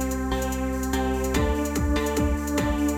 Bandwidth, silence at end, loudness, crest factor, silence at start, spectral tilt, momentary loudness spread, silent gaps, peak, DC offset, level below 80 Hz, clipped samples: 17.5 kHz; 0 s; -25 LUFS; 14 dB; 0 s; -5.5 dB/octave; 3 LU; none; -12 dBFS; under 0.1%; -30 dBFS; under 0.1%